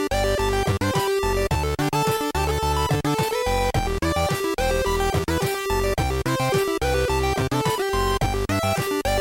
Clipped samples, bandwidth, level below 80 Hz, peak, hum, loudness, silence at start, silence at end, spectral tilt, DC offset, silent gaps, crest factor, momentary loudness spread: under 0.1%; 17 kHz; -32 dBFS; -10 dBFS; none; -23 LUFS; 0 s; 0 s; -5 dB/octave; under 0.1%; none; 12 dB; 2 LU